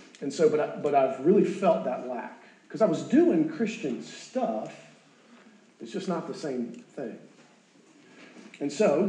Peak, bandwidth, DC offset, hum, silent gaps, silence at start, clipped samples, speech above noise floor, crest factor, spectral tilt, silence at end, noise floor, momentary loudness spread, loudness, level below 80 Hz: -10 dBFS; 9.8 kHz; under 0.1%; none; none; 0 s; under 0.1%; 32 dB; 18 dB; -6.5 dB/octave; 0 s; -58 dBFS; 16 LU; -27 LUFS; under -90 dBFS